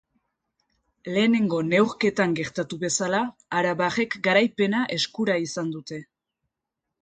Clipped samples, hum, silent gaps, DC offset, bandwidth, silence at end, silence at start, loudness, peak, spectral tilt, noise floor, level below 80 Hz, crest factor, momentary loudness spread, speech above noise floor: under 0.1%; none; none; under 0.1%; 9.6 kHz; 1 s; 1.05 s; -24 LUFS; -6 dBFS; -4.5 dB/octave; -84 dBFS; -66 dBFS; 18 dB; 10 LU; 61 dB